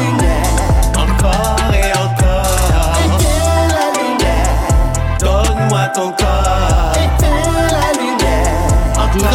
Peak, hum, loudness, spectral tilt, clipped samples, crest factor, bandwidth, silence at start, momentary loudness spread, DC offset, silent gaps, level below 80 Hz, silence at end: 0 dBFS; none; -14 LUFS; -5 dB/octave; under 0.1%; 12 dB; 16.5 kHz; 0 s; 2 LU; under 0.1%; none; -16 dBFS; 0 s